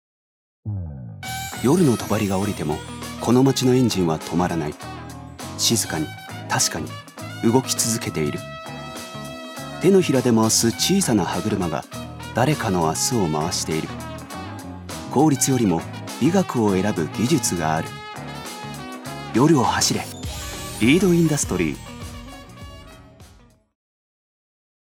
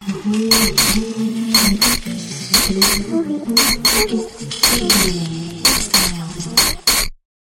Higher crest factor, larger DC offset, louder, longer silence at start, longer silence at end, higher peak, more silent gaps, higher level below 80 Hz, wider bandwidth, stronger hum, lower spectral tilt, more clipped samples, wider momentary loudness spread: about the same, 20 dB vs 16 dB; neither; second, -21 LUFS vs -14 LUFS; first, 0.65 s vs 0 s; first, 1.55 s vs 0.3 s; about the same, -2 dBFS vs 0 dBFS; neither; second, -46 dBFS vs -32 dBFS; about the same, 17.5 kHz vs 17 kHz; neither; first, -4.5 dB/octave vs -2 dB/octave; neither; first, 17 LU vs 11 LU